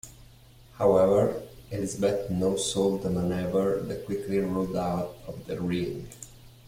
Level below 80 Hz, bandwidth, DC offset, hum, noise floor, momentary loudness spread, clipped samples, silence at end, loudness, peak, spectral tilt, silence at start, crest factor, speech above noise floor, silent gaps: -52 dBFS; 16.5 kHz; under 0.1%; none; -53 dBFS; 16 LU; under 0.1%; 0.2 s; -27 LUFS; -10 dBFS; -6 dB/octave; 0.05 s; 18 dB; 26 dB; none